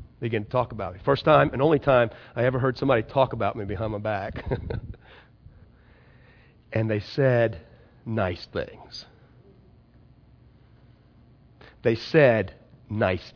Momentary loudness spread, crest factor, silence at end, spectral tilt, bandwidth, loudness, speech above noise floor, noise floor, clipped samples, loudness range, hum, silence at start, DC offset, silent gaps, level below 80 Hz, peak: 16 LU; 22 dB; 0.05 s; -8 dB/octave; 5.4 kHz; -25 LUFS; 31 dB; -55 dBFS; under 0.1%; 12 LU; none; 0 s; under 0.1%; none; -48 dBFS; -4 dBFS